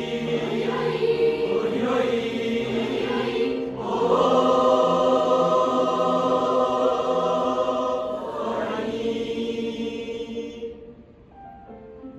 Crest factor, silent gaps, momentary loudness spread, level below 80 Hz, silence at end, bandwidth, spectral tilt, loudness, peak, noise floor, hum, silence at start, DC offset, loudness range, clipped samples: 16 dB; none; 13 LU; -56 dBFS; 0 s; 11.5 kHz; -5.5 dB/octave; -23 LUFS; -8 dBFS; -47 dBFS; none; 0 s; under 0.1%; 9 LU; under 0.1%